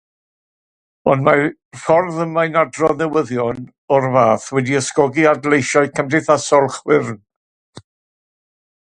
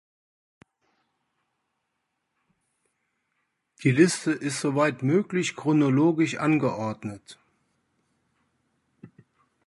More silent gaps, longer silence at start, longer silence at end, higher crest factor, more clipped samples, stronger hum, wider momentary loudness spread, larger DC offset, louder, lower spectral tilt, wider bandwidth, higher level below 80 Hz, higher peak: first, 1.65-1.71 s, 3.78-3.88 s, 7.36-7.73 s vs none; second, 1.05 s vs 3.8 s; first, 1.05 s vs 0.6 s; about the same, 18 dB vs 22 dB; neither; neither; second, 8 LU vs 11 LU; neither; first, -16 LUFS vs -24 LUFS; about the same, -5.5 dB/octave vs -6 dB/octave; about the same, 10.5 kHz vs 11.5 kHz; first, -56 dBFS vs -70 dBFS; first, 0 dBFS vs -6 dBFS